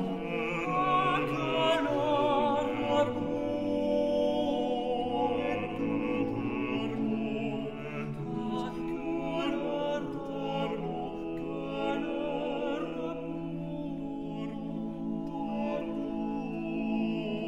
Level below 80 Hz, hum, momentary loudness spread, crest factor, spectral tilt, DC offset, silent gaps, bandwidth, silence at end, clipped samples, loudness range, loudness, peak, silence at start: -54 dBFS; none; 9 LU; 16 dB; -7 dB/octave; 0.3%; none; 11.5 kHz; 0 s; under 0.1%; 7 LU; -32 LUFS; -16 dBFS; 0 s